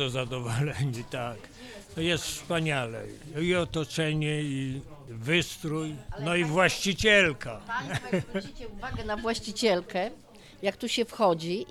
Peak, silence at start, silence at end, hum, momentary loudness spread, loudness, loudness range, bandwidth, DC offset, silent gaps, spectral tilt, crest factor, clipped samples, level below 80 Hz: -8 dBFS; 0 s; 0 s; none; 14 LU; -28 LUFS; 5 LU; 16 kHz; under 0.1%; none; -4.5 dB/octave; 22 dB; under 0.1%; -50 dBFS